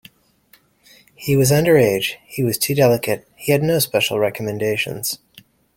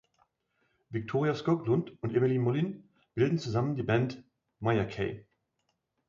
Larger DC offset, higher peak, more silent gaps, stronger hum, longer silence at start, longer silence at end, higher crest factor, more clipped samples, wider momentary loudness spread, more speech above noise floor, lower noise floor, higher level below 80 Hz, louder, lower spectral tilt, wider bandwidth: neither; first, -2 dBFS vs -14 dBFS; neither; neither; first, 1.2 s vs 0.9 s; second, 0.6 s vs 0.85 s; about the same, 18 dB vs 16 dB; neither; about the same, 10 LU vs 11 LU; second, 38 dB vs 50 dB; second, -56 dBFS vs -80 dBFS; first, -52 dBFS vs -62 dBFS; first, -18 LUFS vs -31 LUFS; second, -4.5 dB/octave vs -8 dB/octave; first, 17 kHz vs 7.4 kHz